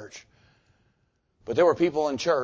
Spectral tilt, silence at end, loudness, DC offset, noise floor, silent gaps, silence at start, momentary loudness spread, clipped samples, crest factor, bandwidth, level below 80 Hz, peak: -5 dB/octave; 0 s; -24 LUFS; under 0.1%; -71 dBFS; none; 0 s; 24 LU; under 0.1%; 18 dB; 8 kHz; -62 dBFS; -10 dBFS